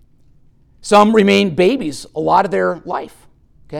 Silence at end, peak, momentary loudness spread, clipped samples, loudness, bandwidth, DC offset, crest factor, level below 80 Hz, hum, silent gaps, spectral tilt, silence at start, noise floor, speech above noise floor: 0 s; 0 dBFS; 15 LU; under 0.1%; -14 LUFS; 14 kHz; under 0.1%; 16 dB; -50 dBFS; none; none; -5.5 dB/octave; 0.8 s; -49 dBFS; 35 dB